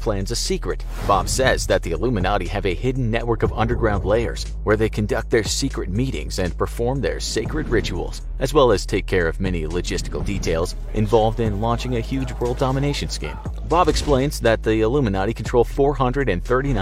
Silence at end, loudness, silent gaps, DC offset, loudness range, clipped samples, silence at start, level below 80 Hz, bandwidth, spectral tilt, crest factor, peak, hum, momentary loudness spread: 0 s; -21 LUFS; none; under 0.1%; 3 LU; under 0.1%; 0 s; -28 dBFS; 15.5 kHz; -5.5 dB/octave; 18 dB; -2 dBFS; none; 8 LU